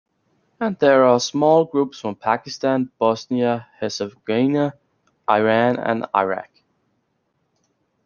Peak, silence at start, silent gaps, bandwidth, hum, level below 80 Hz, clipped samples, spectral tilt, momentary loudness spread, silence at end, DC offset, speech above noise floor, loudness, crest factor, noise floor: -2 dBFS; 0.6 s; none; 7.2 kHz; none; -68 dBFS; under 0.1%; -5.5 dB/octave; 10 LU; 1.6 s; under 0.1%; 51 dB; -20 LUFS; 18 dB; -70 dBFS